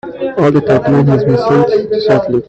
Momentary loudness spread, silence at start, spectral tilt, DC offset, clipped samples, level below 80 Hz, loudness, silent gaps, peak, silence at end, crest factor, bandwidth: 3 LU; 0.05 s; -8.5 dB/octave; under 0.1%; under 0.1%; -44 dBFS; -11 LUFS; none; 0 dBFS; 0.05 s; 10 dB; 8 kHz